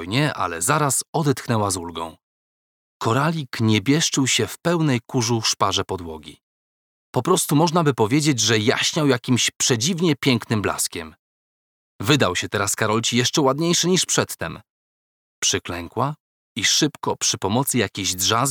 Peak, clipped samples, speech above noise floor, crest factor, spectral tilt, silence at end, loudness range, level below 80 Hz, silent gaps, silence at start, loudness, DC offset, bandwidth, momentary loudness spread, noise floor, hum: -2 dBFS; under 0.1%; over 69 dB; 20 dB; -3.5 dB/octave; 0 s; 4 LU; -56 dBFS; 1.08-1.13 s, 2.23-3.00 s, 6.43-7.13 s, 9.56-9.60 s, 11.19-11.99 s, 14.70-15.42 s, 16.20-16.55 s; 0 s; -20 LUFS; under 0.1%; over 20 kHz; 10 LU; under -90 dBFS; none